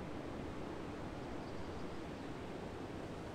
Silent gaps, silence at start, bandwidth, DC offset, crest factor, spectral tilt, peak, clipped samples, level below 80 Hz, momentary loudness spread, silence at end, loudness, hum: none; 0 s; 15.5 kHz; under 0.1%; 14 dB; -6.5 dB/octave; -32 dBFS; under 0.1%; -58 dBFS; 1 LU; 0 s; -47 LUFS; none